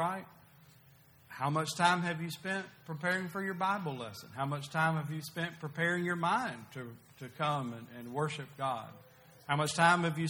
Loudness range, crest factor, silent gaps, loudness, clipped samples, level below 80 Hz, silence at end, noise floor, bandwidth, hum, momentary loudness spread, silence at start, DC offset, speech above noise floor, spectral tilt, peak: 3 LU; 24 dB; none; -34 LUFS; under 0.1%; -74 dBFS; 0 s; -62 dBFS; over 20 kHz; none; 16 LU; 0 s; under 0.1%; 27 dB; -5 dB/octave; -12 dBFS